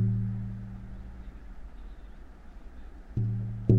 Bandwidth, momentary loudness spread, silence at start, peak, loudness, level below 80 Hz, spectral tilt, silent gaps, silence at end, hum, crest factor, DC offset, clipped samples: 3.6 kHz; 20 LU; 0 s; -8 dBFS; -35 LUFS; -44 dBFS; -11.5 dB/octave; none; 0 s; none; 24 dB; under 0.1%; under 0.1%